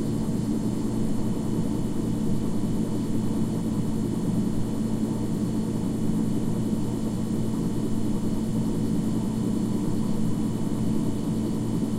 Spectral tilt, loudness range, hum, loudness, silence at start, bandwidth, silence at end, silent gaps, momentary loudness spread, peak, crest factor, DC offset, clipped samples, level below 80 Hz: -7.5 dB/octave; 1 LU; none; -27 LUFS; 0 s; 15.5 kHz; 0 s; none; 1 LU; -12 dBFS; 12 dB; under 0.1%; under 0.1%; -40 dBFS